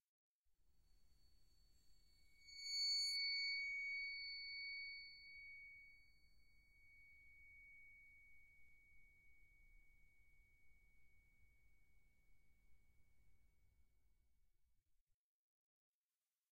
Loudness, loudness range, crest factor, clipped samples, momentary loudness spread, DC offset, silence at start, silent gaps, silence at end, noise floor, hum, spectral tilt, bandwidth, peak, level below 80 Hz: -44 LUFS; 23 LU; 18 dB; under 0.1%; 26 LU; under 0.1%; 1.4 s; none; 1.75 s; under -90 dBFS; none; 3 dB/octave; 15.5 kHz; -36 dBFS; -78 dBFS